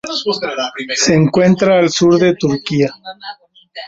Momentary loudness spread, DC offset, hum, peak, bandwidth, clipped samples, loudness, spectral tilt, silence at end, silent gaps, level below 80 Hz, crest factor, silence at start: 19 LU; under 0.1%; none; -2 dBFS; 8 kHz; under 0.1%; -13 LUFS; -5 dB/octave; 0 s; none; -50 dBFS; 12 dB; 0.05 s